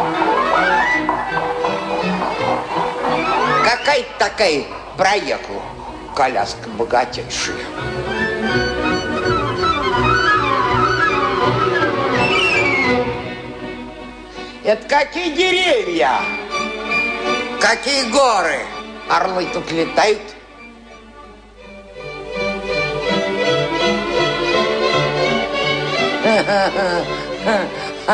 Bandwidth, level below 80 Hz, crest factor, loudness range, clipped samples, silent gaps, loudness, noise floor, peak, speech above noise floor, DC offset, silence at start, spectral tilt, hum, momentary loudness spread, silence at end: 10 kHz; -42 dBFS; 16 dB; 5 LU; under 0.1%; none; -17 LUFS; -40 dBFS; -2 dBFS; 22 dB; under 0.1%; 0 s; -4 dB/octave; none; 11 LU; 0 s